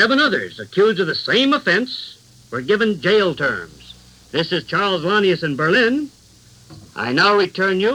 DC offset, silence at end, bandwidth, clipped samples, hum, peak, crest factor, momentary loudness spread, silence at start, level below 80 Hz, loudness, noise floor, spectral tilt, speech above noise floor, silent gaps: under 0.1%; 0 s; 12 kHz; under 0.1%; none; -2 dBFS; 16 dB; 13 LU; 0 s; -56 dBFS; -18 LUFS; -48 dBFS; -5 dB/octave; 30 dB; none